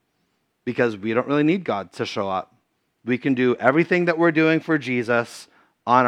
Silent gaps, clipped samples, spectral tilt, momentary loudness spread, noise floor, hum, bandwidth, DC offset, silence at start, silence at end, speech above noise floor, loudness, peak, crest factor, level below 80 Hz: none; under 0.1%; -6.5 dB/octave; 12 LU; -70 dBFS; none; 11.5 kHz; under 0.1%; 0.65 s; 0 s; 49 dB; -21 LUFS; 0 dBFS; 22 dB; -76 dBFS